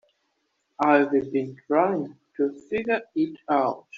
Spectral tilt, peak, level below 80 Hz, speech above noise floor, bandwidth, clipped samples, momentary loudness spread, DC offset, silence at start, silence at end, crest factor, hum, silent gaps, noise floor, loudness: -5 dB/octave; -4 dBFS; -68 dBFS; 50 dB; 7.4 kHz; under 0.1%; 9 LU; under 0.1%; 0.8 s; 0 s; 20 dB; none; none; -74 dBFS; -25 LUFS